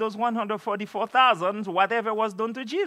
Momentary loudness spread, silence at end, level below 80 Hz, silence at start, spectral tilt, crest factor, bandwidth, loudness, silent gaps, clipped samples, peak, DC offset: 9 LU; 0 s; -86 dBFS; 0 s; -5 dB/octave; 18 dB; 14 kHz; -25 LUFS; none; under 0.1%; -6 dBFS; under 0.1%